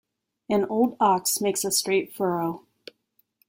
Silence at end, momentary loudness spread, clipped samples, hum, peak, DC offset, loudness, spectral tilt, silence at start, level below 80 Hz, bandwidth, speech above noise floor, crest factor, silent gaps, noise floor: 0.9 s; 7 LU; under 0.1%; none; -8 dBFS; under 0.1%; -24 LUFS; -3.5 dB/octave; 0.5 s; -68 dBFS; 16.5 kHz; 46 dB; 18 dB; none; -70 dBFS